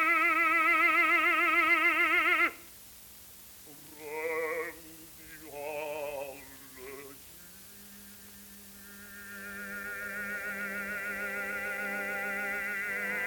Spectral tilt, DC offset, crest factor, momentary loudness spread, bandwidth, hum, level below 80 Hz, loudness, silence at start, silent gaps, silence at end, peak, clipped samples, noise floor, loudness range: -2.5 dB/octave; under 0.1%; 16 dB; 24 LU; 19 kHz; none; -66 dBFS; -28 LUFS; 0 s; none; 0 s; -16 dBFS; under 0.1%; -51 dBFS; 18 LU